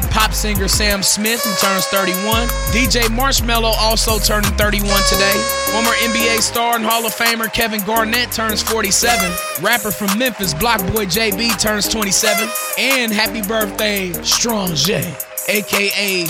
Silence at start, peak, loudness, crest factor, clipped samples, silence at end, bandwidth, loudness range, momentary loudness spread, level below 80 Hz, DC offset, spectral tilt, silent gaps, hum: 0 s; 0 dBFS; -15 LUFS; 16 dB; under 0.1%; 0 s; 16.5 kHz; 2 LU; 4 LU; -26 dBFS; under 0.1%; -2.5 dB/octave; none; none